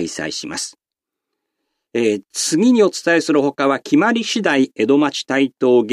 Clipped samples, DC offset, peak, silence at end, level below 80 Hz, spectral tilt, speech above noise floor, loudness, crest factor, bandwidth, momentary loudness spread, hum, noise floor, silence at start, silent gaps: under 0.1%; under 0.1%; -2 dBFS; 0 s; -66 dBFS; -4 dB/octave; 67 dB; -17 LUFS; 14 dB; 15 kHz; 10 LU; none; -84 dBFS; 0 s; none